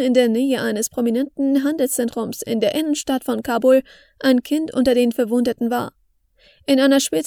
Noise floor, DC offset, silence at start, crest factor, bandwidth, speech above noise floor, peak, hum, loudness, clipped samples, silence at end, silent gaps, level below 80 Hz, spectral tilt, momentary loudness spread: -57 dBFS; under 0.1%; 0 s; 16 dB; 18.5 kHz; 39 dB; -2 dBFS; none; -19 LUFS; under 0.1%; 0 s; none; -56 dBFS; -4 dB/octave; 7 LU